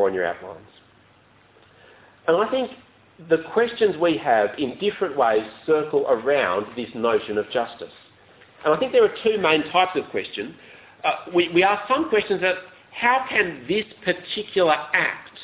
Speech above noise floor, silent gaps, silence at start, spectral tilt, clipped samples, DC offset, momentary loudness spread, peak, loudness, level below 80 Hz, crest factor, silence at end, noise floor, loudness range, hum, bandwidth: 34 dB; none; 0 s; -8.5 dB/octave; under 0.1%; under 0.1%; 10 LU; -4 dBFS; -22 LUFS; -62 dBFS; 20 dB; 0 s; -55 dBFS; 3 LU; none; 4 kHz